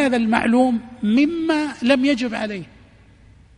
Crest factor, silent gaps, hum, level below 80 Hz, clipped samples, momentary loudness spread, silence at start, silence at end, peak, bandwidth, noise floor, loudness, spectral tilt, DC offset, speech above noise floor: 18 dB; none; none; -52 dBFS; under 0.1%; 8 LU; 0 s; 0.95 s; 0 dBFS; 10.5 kHz; -49 dBFS; -19 LUFS; -5.5 dB/octave; under 0.1%; 30 dB